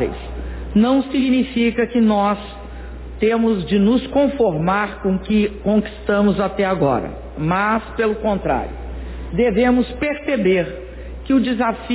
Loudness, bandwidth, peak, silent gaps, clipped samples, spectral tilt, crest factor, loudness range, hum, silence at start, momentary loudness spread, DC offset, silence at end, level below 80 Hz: -18 LUFS; 4 kHz; -4 dBFS; none; under 0.1%; -11 dB/octave; 14 dB; 2 LU; none; 0 s; 14 LU; under 0.1%; 0 s; -34 dBFS